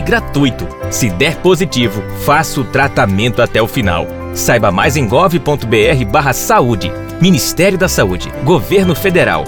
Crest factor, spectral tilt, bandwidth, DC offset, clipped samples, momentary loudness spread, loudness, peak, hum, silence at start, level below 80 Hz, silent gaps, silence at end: 12 dB; -5 dB/octave; over 20 kHz; 0.4%; under 0.1%; 6 LU; -12 LUFS; 0 dBFS; none; 0 s; -30 dBFS; none; 0 s